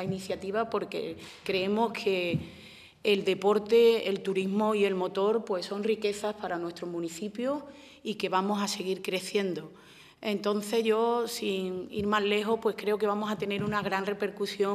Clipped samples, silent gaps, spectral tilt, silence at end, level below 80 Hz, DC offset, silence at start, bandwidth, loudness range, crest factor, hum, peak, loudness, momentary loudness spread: under 0.1%; none; -5 dB/octave; 0 s; -66 dBFS; under 0.1%; 0 s; 15 kHz; 5 LU; 18 dB; none; -12 dBFS; -29 LUFS; 10 LU